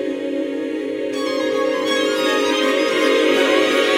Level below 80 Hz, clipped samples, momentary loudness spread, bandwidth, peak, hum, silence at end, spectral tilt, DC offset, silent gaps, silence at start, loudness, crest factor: -64 dBFS; under 0.1%; 8 LU; 17 kHz; -4 dBFS; none; 0 s; -2.5 dB/octave; under 0.1%; none; 0 s; -18 LUFS; 14 dB